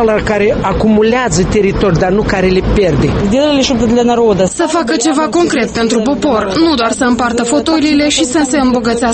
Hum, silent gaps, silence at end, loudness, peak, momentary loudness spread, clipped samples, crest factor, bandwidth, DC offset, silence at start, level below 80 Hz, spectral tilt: none; none; 0 s; -11 LUFS; 0 dBFS; 2 LU; under 0.1%; 10 dB; 8.8 kHz; under 0.1%; 0 s; -26 dBFS; -5 dB/octave